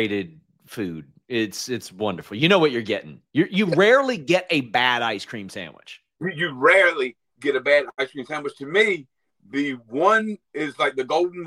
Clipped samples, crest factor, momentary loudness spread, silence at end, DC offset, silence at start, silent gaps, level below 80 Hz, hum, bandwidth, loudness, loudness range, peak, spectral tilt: under 0.1%; 20 dB; 15 LU; 0 s; under 0.1%; 0 s; none; -68 dBFS; none; 16 kHz; -22 LUFS; 4 LU; -2 dBFS; -4.5 dB/octave